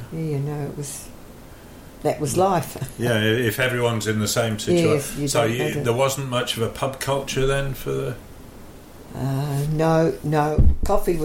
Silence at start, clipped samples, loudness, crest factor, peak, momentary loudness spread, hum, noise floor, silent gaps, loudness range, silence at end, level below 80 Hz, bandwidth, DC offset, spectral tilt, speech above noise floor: 0 s; under 0.1%; -22 LUFS; 18 dB; -4 dBFS; 12 LU; none; -42 dBFS; none; 5 LU; 0 s; -32 dBFS; 16.5 kHz; under 0.1%; -5 dB/octave; 21 dB